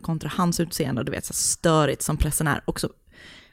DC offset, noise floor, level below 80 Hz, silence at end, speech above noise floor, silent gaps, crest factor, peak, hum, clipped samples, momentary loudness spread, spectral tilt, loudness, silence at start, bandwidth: under 0.1%; -48 dBFS; -38 dBFS; 0.1 s; 24 dB; none; 18 dB; -6 dBFS; none; under 0.1%; 8 LU; -4.5 dB/octave; -24 LUFS; 0.05 s; 16.5 kHz